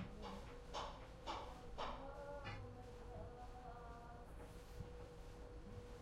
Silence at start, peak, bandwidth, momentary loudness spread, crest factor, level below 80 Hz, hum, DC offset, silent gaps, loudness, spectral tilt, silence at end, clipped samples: 0 s; -34 dBFS; 16 kHz; 7 LU; 18 dB; -58 dBFS; none; under 0.1%; none; -54 LUFS; -5.5 dB/octave; 0 s; under 0.1%